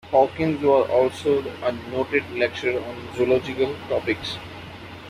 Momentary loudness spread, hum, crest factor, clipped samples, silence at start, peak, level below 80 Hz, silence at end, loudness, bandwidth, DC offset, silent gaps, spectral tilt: 13 LU; none; 18 dB; under 0.1%; 0.05 s; -4 dBFS; -54 dBFS; 0 s; -23 LUFS; 13.5 kHz; under 0.1%; none; -6 dB/octave